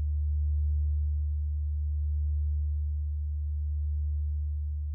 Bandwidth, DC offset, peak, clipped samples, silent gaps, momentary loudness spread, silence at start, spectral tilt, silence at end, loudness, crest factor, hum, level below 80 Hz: 0.4 kHz; under 0.1%; -24 dBFS; under 0.1%; none; 4 LU; 0 s; -13.5 dB/octave; 0 s; -32 LUFS; 6 dB; none; -30 dBFS